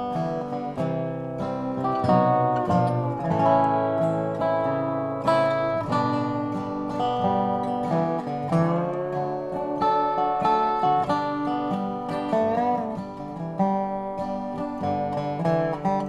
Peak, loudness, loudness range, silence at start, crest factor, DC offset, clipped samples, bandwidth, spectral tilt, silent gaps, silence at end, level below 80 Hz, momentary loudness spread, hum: -8 dBFS; -25 LUFS; 4 LU; 0 s; 16 dB; under 0.1%; under 0.1%; 11.5 kHz; -8 dB/octave; none; 0 s; -56 dBFS; 8 LU; none